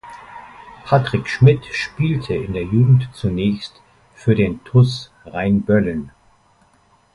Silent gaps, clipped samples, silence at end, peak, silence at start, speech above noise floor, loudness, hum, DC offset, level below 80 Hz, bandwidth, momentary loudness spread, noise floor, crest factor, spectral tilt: none; under 0.1%; 1.05 s; 0 dBFS; 0.05 s; 39 dB; -18 LUFS; none; under 0.1%; -42 dBFS; 11 kHz; 21 LU; -56 dBFS; 18 dB; -8 dB/octave